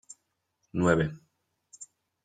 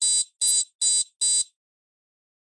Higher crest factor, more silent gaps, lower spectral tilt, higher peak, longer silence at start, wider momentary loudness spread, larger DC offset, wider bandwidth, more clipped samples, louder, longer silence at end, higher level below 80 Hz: first, 22 dB vs 16 dB; second, none vs 0.75-0.79 s; first, -6.5 dB/octave vs 5.5 dB/octave; about the same, -10 dBFS vs -10 dBFS; first, 0.75 s vs 0 s; first, 24 LU vs 2 LU; neither; second, 9.4 kHz vs 11.5 kHz; neither; second, -28 LUFS vs -21 LUFS; second, 0.4 s vs 1.05 s; first, -58 dBFS vs -72 dBFS